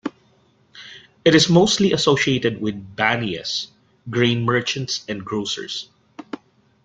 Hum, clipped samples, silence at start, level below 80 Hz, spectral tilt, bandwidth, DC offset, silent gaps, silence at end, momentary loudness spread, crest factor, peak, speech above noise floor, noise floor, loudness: none; under 0.1%; 0.05 s; -54 dBFS; -4.5 dB/octave; 9.4 kHz; under 0.1%; none; 0.5 s; 22 LU; 20 dB; -2 dBFS; 39 dB; -58 dBFS; -19 LUFS